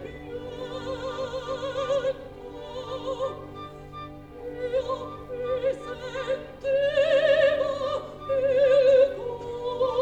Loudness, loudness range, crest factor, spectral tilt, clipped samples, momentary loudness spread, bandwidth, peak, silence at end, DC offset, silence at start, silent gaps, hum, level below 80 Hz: -26 LUFS; 10 LU; 16 dB; -5 dB/octave; under 0.1%; 19 LU; 8.4 kHz; -10 dBFS; 0 s; under 0.1%; 0 s; none; none; -52 dBFS